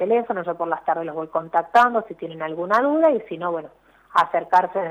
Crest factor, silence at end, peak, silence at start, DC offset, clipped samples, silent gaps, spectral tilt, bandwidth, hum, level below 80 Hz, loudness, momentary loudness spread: 14 dB; 0 s; -6 dBFS; 0 s; under 0.1%; under 0.1%; none; -6 dB/octave; 12 kHz; none; -66 dBFS; -21 LUFS; 11 LU